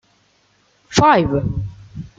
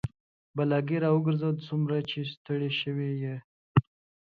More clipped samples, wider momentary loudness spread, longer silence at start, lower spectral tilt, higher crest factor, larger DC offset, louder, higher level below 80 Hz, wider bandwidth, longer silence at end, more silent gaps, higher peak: neither; first, 18 LU vs 10 LU; first, 0.9 s vs 0.05 s; second, -5.5 dB/octave vs -9 dB/octave; about the same, 18 dB vs 20 dB; neither; first, -16 LUFS vs -29 LUFS; first, -38 dBFS vs -58 dBFS; first, 9.4 kHz vs 5 kHz; second, 0.1 s vs 0.55 s; second, none vs 0.20-0.54 s, 2.37-2.45 s, 3.44-3.75 s; first, -2 dBFS vs -8 dBFS